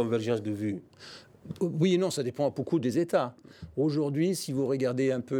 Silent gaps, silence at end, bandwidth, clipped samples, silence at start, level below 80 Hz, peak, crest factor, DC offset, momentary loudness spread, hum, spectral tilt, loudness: none; 0 s; 18 kHz; under 0.1%; 0 s; -66 dBFS; -12 dBFS; 16 dB; under 0.1%; 19 LU; none; -6.5 dB/octave; -29 LUFS